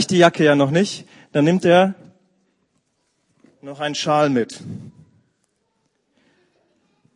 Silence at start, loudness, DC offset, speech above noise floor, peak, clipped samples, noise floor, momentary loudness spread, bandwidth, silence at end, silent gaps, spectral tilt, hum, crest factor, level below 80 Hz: 0 s; -17 LUFS; under 0.1%; 52 dB; 0 dBFS; under 0.1%; -69 dBFS; 22 LU; 11 kHz; 2.25 s; none; -5.5 dB/octave; none; 20 dB; -66 dBFS